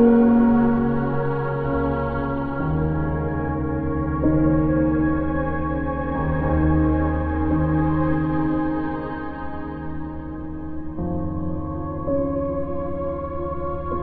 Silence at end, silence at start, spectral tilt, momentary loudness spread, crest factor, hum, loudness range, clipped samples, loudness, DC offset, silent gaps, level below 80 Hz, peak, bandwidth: 0 s; 0 s; -12 dB/octave; 12 LU; 16 dB; none; 6 LU; under 0.1%; -23 LUFS; under 0.1%; none; -34 dBFS; -6 dBFS; 4.4 kHz